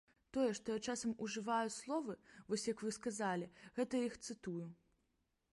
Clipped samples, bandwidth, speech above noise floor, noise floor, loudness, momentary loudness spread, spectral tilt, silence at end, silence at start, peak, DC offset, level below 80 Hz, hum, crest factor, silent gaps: under 0.1%; 11.5 kHz; 42 dB; -83 dBFS; -42 LUFS; 9 LU; -4 dB/octave; 0.8 s; 0.35 s; -26 dBFS; under 0.1%; -76 dBFS; none; 18 dB; none